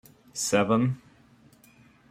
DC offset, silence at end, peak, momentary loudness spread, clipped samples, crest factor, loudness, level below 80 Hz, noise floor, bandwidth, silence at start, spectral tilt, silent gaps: under 0.1%; 1.15 s; -8 dBFS; 16 LU; under 0.1%; 22 dB; -25 LUFS; -66 dBFS; -57 dBFS; 16 kHz; 0.35 s; -5 dB/octave; none